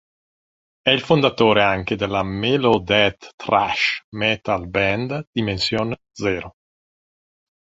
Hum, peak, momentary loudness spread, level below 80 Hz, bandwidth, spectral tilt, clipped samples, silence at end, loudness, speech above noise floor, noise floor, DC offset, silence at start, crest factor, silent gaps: none; 0 dBFS; 9 LU; -46 dBFS; 8 kHz; -5.5 dB/octave; under 0.1%; 1.15 s; -20 LUFS; over 70 dB; under -90 dBFS; under 0.1%; 0.85 s; 20 dB; 3.34-3.38 s, 4.04-4.12 s, 5.27-5.33 s